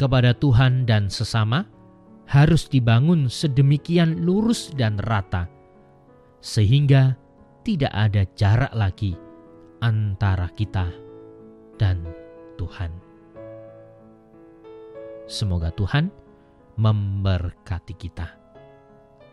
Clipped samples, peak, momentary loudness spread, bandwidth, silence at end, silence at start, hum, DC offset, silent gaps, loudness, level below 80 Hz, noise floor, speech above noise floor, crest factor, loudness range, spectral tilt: under 0.1%; -6 dBFS; 20 LU; 11.5 kHz; 1 s; 0 s; none; under 0.1%; none; -21 LUFS; -40 dBFS; -52 dBFS; 32 dB; 16 dB; 12 LU; -7 dB/octave